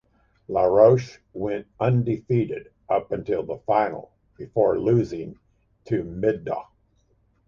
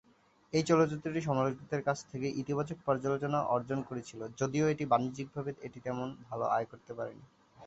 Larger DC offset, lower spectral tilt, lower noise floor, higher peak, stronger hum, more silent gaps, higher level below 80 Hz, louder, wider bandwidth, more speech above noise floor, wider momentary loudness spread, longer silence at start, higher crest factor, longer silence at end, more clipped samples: neither; first, -9 dB/octave vs -6.5 dB/octave; about the same, -64 dBFS vs -66 dBFS; first, -4 dBFS vs -14 dBFS; neither; neither; first, -54 dBFS vs -68 dBFS; first, -23 LUFS vs -34 LUFS; second, 7 kHz vs 8.2 kHz; first, 42 dB vs 33 dB; first, 16 LU vs 13 LU; about the same, 0.5 s vs 0.55 s; about the same, 20 dB vs 20 dB; first, 0.85 s vs 0 s; neither